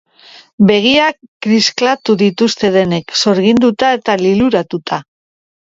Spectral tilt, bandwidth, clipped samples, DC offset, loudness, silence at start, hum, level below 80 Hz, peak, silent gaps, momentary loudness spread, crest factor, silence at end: -5 dB/octave; 7.8 kHz; under 0.1%; under 0.1%; -12 LUFS; 0.6 s; none; -50 dBFS; 0 dBFS; 1.28-1.40 s; 8 LU; 14 dB; 0.75 s